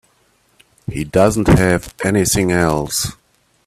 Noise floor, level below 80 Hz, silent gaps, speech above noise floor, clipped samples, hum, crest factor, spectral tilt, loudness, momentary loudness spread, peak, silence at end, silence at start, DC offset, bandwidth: -58 dBFS; -34 dBFS; none; 43 dB; under 0.1%; none; 16 dB; -5 dB/octave; -16 LUFS; 12 LU; 0 dBFS; 0.55 s; 0.9 s; under 0.1%; 16 kHz